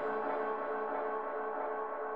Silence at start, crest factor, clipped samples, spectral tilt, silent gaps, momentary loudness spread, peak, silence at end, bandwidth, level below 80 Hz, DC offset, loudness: 0 s; 12 dB; under 0.1%; -7 dB/octave; none; 2 LU; -24 dBFS; 0 s; 5 kHz; -84 dBFS; 0.2%; -37 LUFS